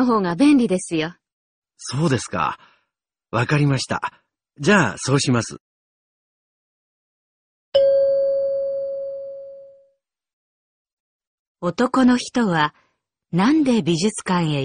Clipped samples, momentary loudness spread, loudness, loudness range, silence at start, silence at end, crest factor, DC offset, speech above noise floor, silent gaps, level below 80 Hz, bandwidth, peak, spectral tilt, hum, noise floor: under 0.1%; 13 LU; -20 LUFS; 5 LU; 0 s; 0 s; 20 dB; under 0.1%; 61 dB; 1.33-1.62 s, 5.60-7.72 s, 10.33-10.85 s, 10.93-11.20 s, 11.27-11.55 s; -56 dBFS; 10 kHz; -2 dBFS; -5.5 dB/octave; none; -79 dBFS